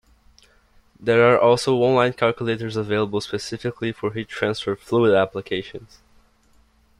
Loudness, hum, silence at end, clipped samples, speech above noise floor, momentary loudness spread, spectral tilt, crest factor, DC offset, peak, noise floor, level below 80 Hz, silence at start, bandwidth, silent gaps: -21 LUFS; none; 1.15 s; under 0.1%; 37 dB; 12 LU; -6 dB/octave; 18 dB; under 0.1%; -4 dBFS; -58 dBFS; -56 dBFS; 1 s; 12 kHz; none